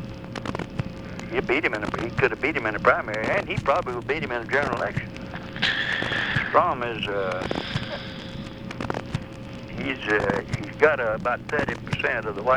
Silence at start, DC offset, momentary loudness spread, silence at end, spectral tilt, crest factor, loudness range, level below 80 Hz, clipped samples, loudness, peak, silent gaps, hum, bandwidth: 0 s; 0.1%; 14 LU; 0 s; -5.5 dB/octave; 22 dB; 5 LU; -46 dBFS; under 0.1%; -25 LUFS; -4 dBFS; none; none; 14.5 kHz